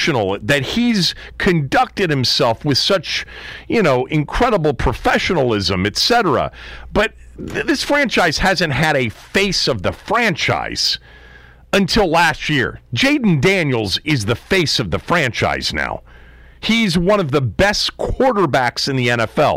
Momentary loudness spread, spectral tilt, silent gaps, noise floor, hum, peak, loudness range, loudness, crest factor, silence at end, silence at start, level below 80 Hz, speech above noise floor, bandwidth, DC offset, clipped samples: 6 LU; -4.5 dB/octave; none; -42 dBFS; none; -6 dBFS; 1 LU; -16 LUFS; 10 dB; 0 s; 0 s; -34 dBFS; 26 dB; 16 kHz; under 0.1%; under 0.1%